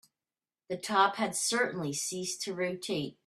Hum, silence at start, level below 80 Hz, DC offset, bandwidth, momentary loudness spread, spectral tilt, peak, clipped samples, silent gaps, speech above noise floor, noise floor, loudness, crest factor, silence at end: none; 0.7 s; -76 dBFS; under 0.1%; 15 kHz; 8 LU; -2.5 dB/octave; -14 dBFS; under 0.1%; none; over 58 dB; under -90 dBFS; -31 LUFS; 20 dB; 0.15 s